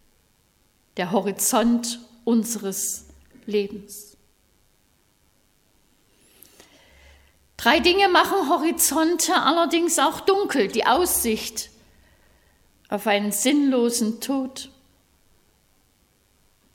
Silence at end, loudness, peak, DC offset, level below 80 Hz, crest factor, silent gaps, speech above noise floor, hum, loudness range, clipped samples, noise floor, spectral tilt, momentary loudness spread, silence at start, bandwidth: 2.05 s; -21 LUFS; -2 dBFS; under 0.1%; -56 dBFS; 22 dB; none; 42 dB; none; 11 LU; under 0.1%; -63 dBFS; -2.5 dB/octave; 15 LU; 0.95 s; 18.5 kHz